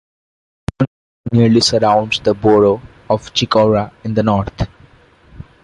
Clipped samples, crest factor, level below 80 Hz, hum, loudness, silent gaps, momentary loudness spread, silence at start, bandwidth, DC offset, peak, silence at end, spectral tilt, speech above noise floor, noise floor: under 0.1%; 14 dB; -38 dBFS; none; -15 LUFS; 0.87-1.24 s; 13 LU; 0.8 s; 11 kHz; under 0.1%; 0 dBFS; 0.2 s; -5.5 dB/octave; 33 dB; -47 dBFS